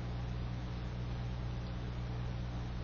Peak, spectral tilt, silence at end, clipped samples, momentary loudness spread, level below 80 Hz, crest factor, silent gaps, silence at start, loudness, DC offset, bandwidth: -30 dBFS; -6.5 dB/octave; 0 s; under 0.1%; 1 LU; -44 dBFS; 10 dB; none; 0 s; -41 LUFS; under 0.1%; 6.8 kHz